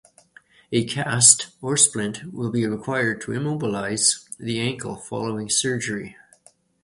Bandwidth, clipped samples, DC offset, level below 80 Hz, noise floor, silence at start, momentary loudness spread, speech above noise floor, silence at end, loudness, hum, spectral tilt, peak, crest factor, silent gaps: 13 kHz; under 0.1%; under 0.1%; -60 dBFS; -57 dBFS; 0.7 s; 15 LU; 34 dB; 0.7 s; -21 LUFS; none; -2.5 dB/octave; 0 dBFS; 24 dB; none